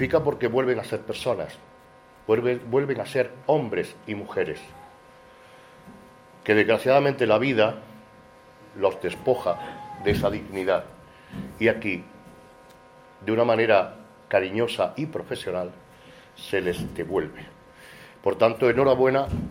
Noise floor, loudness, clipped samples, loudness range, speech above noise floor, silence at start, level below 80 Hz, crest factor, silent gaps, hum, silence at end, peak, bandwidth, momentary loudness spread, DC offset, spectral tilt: -52 dBFS; -24 LUFS; under 0.1%; 6 LU; 28 dB; 0 s; -52 dBFS; 20 dB; none; none; 0 s; -6 dBFS; 16 kHz; 17 LU; under 0.1%; -6.5 dB/octave